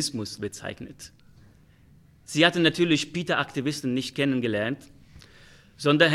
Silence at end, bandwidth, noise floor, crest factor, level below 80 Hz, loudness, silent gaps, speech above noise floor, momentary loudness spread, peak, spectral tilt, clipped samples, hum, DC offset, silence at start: 0 s; 14.5 kHz; -55 dBFS; 24 dB; -60 dBFS; -25 LUFS; none; 30 dB; 17 LU; -4 dBFS; -4.5 dB/octave; under 0.1%; none; under 0.1%; 0 s